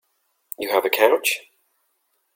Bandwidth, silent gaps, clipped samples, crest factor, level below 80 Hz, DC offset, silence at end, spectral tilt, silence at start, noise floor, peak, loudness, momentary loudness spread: 17 kHz; none; under 0.1%; 20 dB; -72 dBFS; under 0.1%; 0.95 s; -0.5 dB/octave; 0.6 s; -70 dBFS; -2 dBFS; -20 LUFS; 13 LU